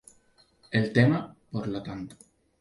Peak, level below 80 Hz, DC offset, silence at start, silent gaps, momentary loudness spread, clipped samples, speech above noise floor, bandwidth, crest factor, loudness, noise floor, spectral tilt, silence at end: -8 dBFS; -60 dBFS; under 0.1%; 0.7 s; none; 17 LU; under 0.1%; 37 dB; 11.5 kHz; 22 dB; -27 LUFS; -63 dBFS; -7.5 dB/octave; 0.45 s